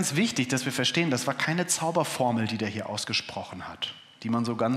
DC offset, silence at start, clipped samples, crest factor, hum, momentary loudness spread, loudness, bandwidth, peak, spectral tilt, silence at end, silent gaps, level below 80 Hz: under 0.1%; 0 s; under 0.1%; 18 dB; none; 9 LU; -27 LUFS; 15.5 kHz; -10 dBFS; -3.5 dB/octave; 0 s; none; -72 dBFS